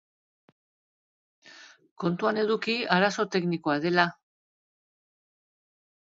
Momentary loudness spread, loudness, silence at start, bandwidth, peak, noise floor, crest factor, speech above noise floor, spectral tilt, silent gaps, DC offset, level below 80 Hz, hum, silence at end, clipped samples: 5 LU; -26 LUFS; 1.45 s; 7.8 kHz; -6 dBFS; -52 dBFS; 24 dB; 26 dB; -5.5 dB/octave; 1.91-1.96 s; under 0.1%; -76 dBFS; none; 2 s; under 0.1%